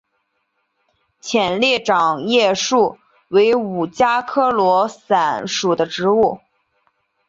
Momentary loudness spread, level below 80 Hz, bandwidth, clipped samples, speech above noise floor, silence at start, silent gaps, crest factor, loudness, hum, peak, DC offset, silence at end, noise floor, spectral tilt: 5 LU; -58 dBFS; 7.8 kHz; under 0.1%; 53 dB; 1.25 s; none; 16 dB; -17 LUFS; none; -2 dBFS; under 0.1%; 0.9 s; -70 dBFS; -3.5 dB/octave